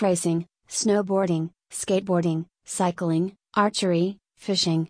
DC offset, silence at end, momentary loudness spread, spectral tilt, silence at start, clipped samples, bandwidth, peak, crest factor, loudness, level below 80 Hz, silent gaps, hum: under 0.1%; 0.05 s; 9 LU; -5 dB/octave; 0 s; under 0.1%; 10.5 kHz; -8 dBFS; 16 dB; -25 LUFS; -66 dBFS; none; none